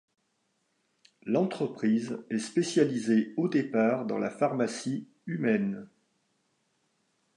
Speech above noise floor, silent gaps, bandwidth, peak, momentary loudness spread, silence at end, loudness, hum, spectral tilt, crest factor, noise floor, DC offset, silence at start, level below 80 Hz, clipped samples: 47 dB; none; 11 kHz; -10 dBFS; 8 LU; 1.5 s; -29 LUFS; none; -6 dB/octave; 20 dB; -76 dBFS; under 0.1%; 1.25 s; -80 dBFS; under 0.1%